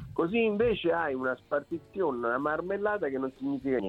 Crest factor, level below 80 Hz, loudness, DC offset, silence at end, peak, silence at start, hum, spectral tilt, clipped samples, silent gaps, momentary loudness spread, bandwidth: 14 dB; -58 dBFS; -30 LUFS; under 0.1%; 0 s; -16 dBFS; 0 s; none; -8 dB/octave; under 0.1%; none; 7 LU; 5.2 kHz